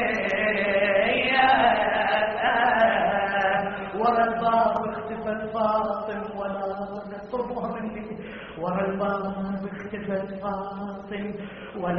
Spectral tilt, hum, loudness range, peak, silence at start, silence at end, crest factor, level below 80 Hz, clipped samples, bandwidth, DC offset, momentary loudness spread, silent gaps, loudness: -2.5 dB/octave; none; 9 LU; -6 dBFS; 0 s; 0 s; 18 dB; -54 dBFS; under 0.1%; 5.6 kHz; under 0.1%; 14 LU; none; -25 LUFS